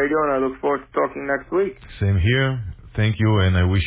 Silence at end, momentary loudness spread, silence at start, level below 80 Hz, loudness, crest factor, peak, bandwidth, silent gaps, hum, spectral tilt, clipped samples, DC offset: 0 s; 7 LU; 0 s; -32 dBFS; -21 LUFS; 14 dB; -6 dBFS; 4 kHz; none; none; -11 dB/octave; under 0.1%; under 0.1%